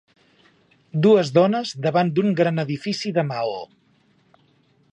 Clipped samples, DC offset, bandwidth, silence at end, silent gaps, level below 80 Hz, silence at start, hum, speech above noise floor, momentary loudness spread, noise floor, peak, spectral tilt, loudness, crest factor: under 0.1%; under 0.1%; 8.8 kHz; 1.25 s; none; -70 dBFS; 0.95 s; none; 41 dB; 12 LU; -60 dBFS; -4 dBFS; -6.5 dB/octave; -21 LUFS; 18 dB